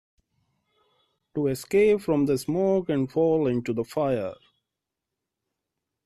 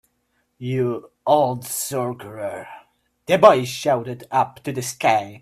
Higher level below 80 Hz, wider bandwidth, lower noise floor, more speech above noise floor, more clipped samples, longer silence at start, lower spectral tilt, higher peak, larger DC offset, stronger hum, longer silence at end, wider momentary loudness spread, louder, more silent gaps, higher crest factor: about the same, -60 dBFS vs -62 dBFS; second, 13.5 kHz vs 16 kHz; first, -86 dBFS vs -69 dBFS; first, 62 dB vs 49 dB; neither; first, 1.35 s vs 0.6 s; first, -7 dB/octave vs -4.5 dB/octave; second, -12 dBFS vs 0 dBFS; neither; neither; first, 1.7 s vs 0.05 s; second, 8 LU vs 16 LU; second, -25 LUFS vs -21 LUFS; neither; second, 16 dB vs 22 dB